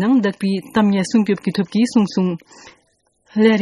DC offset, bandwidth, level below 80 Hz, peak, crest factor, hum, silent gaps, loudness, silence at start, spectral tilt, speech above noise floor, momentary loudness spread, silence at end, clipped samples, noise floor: under 0.1%; 11.5 kHz; -60 dBFS; -2 dBFS; 16 dB; none; none; -18 LUFS; 0 s; -6.5 dB/octave; 45 dB; 6 LU; 0 s; under 0.1%; -62 dBFS